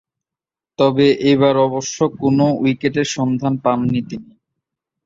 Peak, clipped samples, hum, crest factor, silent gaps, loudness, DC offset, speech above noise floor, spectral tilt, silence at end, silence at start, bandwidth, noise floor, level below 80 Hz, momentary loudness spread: -2 dBFS; under 0.1%; none; 16 dB; none; -17 LUFS; under 0.1%; 73 dB; -6 dB/octave; 0.85 s; 0.8 s; 7.8 kHz; -89 dBFS; -54 dBFS; 8 LU